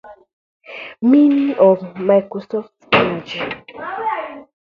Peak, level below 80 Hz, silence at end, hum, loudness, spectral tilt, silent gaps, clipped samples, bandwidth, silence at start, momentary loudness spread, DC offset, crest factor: 0 dBFS; -58 dBFS; 0.25 s; none; -17 LUFS; -7.5 dB/octave; 0.33-0.60 s; under 0.1%; 6.8 kHz; 0.05 s; 17 LU; under 0.1%; 18 dB